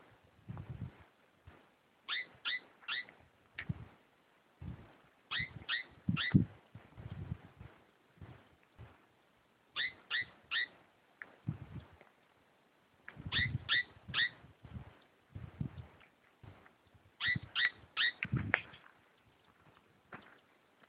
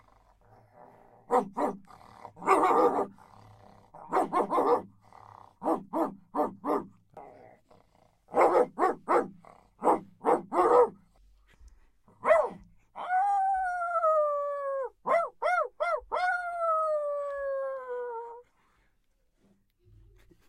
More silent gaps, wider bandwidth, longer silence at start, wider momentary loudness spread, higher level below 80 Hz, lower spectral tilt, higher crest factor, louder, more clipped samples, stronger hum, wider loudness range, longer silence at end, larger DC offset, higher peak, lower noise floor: neither; second, 5.2 kHz vs 13.5 kHz; second, 0.45 s vs 1.3 s; first, 24 LU vs 12 LU; about the same, -62 dBFS vs -66 dBFS; first, -7 dB/octave vs -5.5 dB/octave; first, 34 dB vs 22 dB; second, -38 LUFS vs -29 LUFS; neither; neither; about the same, 7 LU vs 6 LU; second, 0.6 s vs 2.05 s; neither; about the same, -8 dBFS vs -8 dBFS; about the same, -71 dBFS vs -71 dBFS